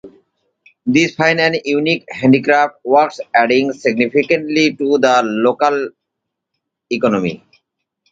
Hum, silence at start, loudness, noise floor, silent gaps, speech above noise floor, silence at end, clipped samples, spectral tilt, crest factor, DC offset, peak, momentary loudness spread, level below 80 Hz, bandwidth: none; 0.05 s; -15 LUFS; -78 dBFS; none; 64 dB; 0.75 s; under 0.1%; -5 dB/octave; 16 dB; under 0.1%; 0 dBFS; 7 LU; -60 dBFS; 7.8 kHz